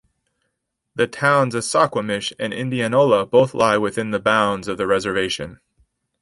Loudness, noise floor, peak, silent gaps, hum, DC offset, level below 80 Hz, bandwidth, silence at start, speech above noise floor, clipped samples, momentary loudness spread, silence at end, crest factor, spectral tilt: -19 LUFS; -76 dBFS; -2 dBFS; none; none; under 0.1%; -54 dBFS; 11.5 kHz; 0.95 s; 57 dB; under 0.1%; 9 LU; 0.65 s; 18 dB; -4.5 dB/octave